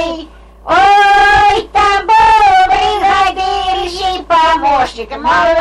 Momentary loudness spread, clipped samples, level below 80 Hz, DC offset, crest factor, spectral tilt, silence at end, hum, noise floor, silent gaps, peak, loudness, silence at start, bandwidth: 11 LU; under 0.1%; -32 dBFS; under 0.1%; 8 dB; -3 dB/octave; 0 s; none; -32 dBFS; none; -2 dBFS; -10 LUFS; 0 s; 12 kHz